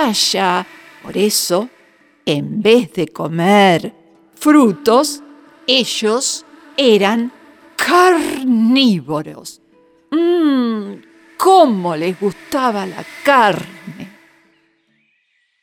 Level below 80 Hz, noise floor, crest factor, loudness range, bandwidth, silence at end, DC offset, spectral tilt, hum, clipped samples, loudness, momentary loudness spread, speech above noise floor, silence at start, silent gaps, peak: -62 dBFS; -63 dBFS; 16 dB; 3 LU; 19.5 kHz; 1.55 s; under 0.1%; -4 dB/octave; none; under 0.1%; -14 LUFS; 19 LU; 49 dB; 0 s; none; 0 dBFS